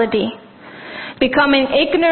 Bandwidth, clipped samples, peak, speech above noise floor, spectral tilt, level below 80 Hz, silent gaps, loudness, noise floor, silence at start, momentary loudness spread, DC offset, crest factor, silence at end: 4.4 kHz; under 0.1%; 0 dBFS; 21 dB; -9.5 dB/octave; -48 dBFS; none; -15 LUFS; -36 dBFS; 0 s; 20 LU; under 0.1%; 16 dB; 0 s